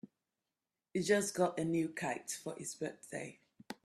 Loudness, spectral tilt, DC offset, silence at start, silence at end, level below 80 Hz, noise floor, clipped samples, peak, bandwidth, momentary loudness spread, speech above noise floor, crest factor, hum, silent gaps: -37 LUFS; -4.5 dB/octave; under 0.1%; 0.05 s; 0.1 s; -78 dBFS; under -90 dBFS; under 0.1%; -18 dBFS; 13.5 kHz; 13 LU; over 53 dB; 20 dB; none; none